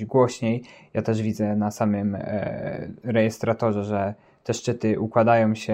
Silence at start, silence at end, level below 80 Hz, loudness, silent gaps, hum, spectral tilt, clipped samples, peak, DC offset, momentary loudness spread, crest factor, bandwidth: 0 s; 0 s; -62 dBFS; -24 LUFS; none; none; -7 dB/octave; under 0.1%; -6 dBFS; under 0.1%; 11 LU; 18 dB; 15 kHz